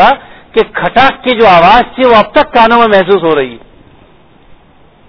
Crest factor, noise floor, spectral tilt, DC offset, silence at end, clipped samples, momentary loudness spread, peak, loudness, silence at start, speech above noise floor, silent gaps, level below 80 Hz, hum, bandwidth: 8 dB; -42 dBFS; -6.5 dB/octave; under 0.1%; 0.55 s; 3%; 9 LU; 0 dBFS; -7 LUFS; 0 s; 36 dB; none; -34 dBFS; none; 5.4 kHz